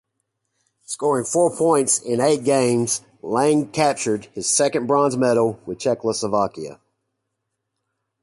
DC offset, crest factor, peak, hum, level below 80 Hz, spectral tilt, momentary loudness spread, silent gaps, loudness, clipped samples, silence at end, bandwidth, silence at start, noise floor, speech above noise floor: under 0.1%; 18 dB; -4 dBFS; none; -62 dBFS; -4 dB/octave; 7 LU; none; -20 LUFS; under 0.1%; 1.5 s; 11.5 kHz; 0.9 s; -78 dBFS; 58 dB